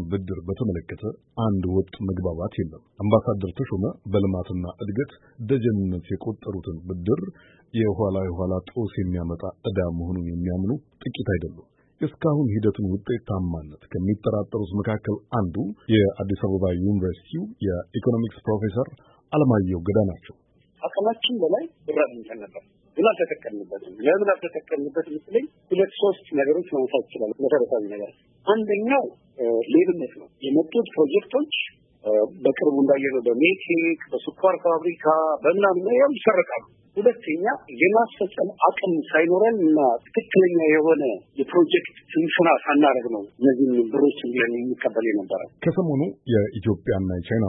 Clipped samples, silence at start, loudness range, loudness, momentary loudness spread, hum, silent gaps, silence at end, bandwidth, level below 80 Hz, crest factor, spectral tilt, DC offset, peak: under 0.1%; 0 s; 7 LU; -23 LUFS; 12 LU; none; none; 0 s; 4 kHz; -52 dBFS; 20 dB; -11.5 dB/octave; under 0.1%; -4 dBFS